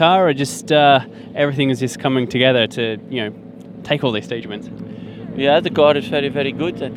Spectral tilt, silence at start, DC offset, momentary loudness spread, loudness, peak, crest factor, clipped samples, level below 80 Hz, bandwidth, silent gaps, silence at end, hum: -5 dB/octave; 0 s; under 0.1%; 18 LU; -17 LUFS; 0 dBFS; 18 dB; under 0.1%; -56 dBFS; 15 kHz; none; 0 s; none